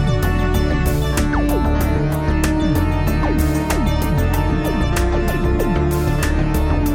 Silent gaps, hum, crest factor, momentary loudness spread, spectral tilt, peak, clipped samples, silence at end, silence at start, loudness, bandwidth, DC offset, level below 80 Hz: none; none; 12 dB; 1 LU; -6.5 dB/octave; -4 dBFS; under 0.1%; 0 s; 0 s; -18 LUFS; 17 kHz; under 0.1%; -20 dBFS